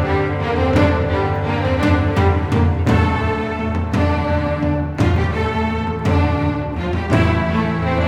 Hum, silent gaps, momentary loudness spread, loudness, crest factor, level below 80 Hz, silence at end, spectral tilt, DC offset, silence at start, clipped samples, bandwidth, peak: none; none; 5 LU; -18 LUFS; 16 dB; -28 dBFS; 0 s; -8 dB/octave; under 0.1%; 0 s; under 0.1%; 9 kHz; -2 dBFS